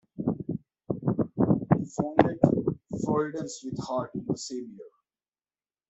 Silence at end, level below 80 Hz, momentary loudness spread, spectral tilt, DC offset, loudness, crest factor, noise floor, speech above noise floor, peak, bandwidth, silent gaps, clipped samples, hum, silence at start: 1 s; -58 dBFS; 13 LU; -7 dB/octave; under 0.1%; -28 LUFS; 26 dB; under -90 dBFS; over 61 dB; -2 dBFS; 8.2 kHz; none; under 0.1%; none; 0.2 s